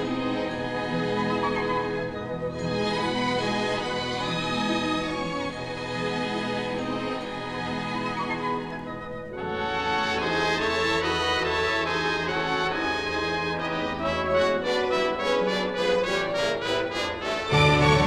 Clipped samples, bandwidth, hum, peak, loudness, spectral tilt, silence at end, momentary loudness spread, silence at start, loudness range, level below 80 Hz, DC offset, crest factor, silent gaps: under 0.1%; 13.5 kHz; none; -8 dBFS; -26 LUFS; -5 dB/octave; 0 s; 7 LU; 0 s; 5 LU; -48 dBFS; under 0.1%; 18 dB; none